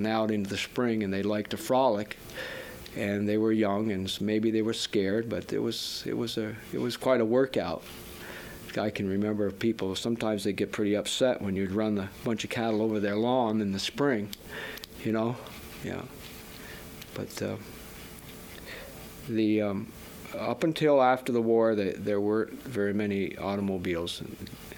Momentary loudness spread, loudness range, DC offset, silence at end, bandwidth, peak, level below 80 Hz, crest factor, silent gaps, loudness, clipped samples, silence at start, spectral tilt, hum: 16 LU; 9 LU; under 0.1%; 0 s; over 20 kHz; -10 dBFS; -58 dBFS; 20 dB; none; -29 LUFS; under 0.1%; 0 s; -5.5 dB/octave; none